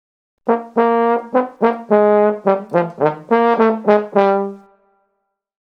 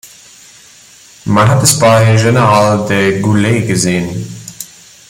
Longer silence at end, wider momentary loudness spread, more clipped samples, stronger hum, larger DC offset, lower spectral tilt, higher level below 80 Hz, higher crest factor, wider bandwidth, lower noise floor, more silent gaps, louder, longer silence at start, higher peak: first, 1.05 s vs 0.45 s; second, 7 LU vs 18 LU; neither; neither; neither; first, -8.5 dB/octave vs -5 dB/octave; second, -68 dBFS vs -44 dBFS; about the same, 16 dB vs 12 dB; second, 6 kHz vs 16.5 kHz; first, -72 dBFS vs -40 dBFS; neither; second, -16 LUFS vs -10 LUFS; first, 0.45 s vs 0.05 s; about the same, 0 dBFS vs 0 dBFS